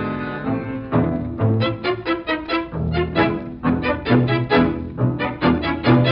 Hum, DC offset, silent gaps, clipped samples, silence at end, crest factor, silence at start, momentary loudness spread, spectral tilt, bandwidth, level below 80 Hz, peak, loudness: none; under 0.1%; none; under 0.1%; 0 s; 18 dB; 0 s; 7 LU; -10 dB/octave; 5.6 kHz; -38 dBFS; -2 dBFS; -20 LUFS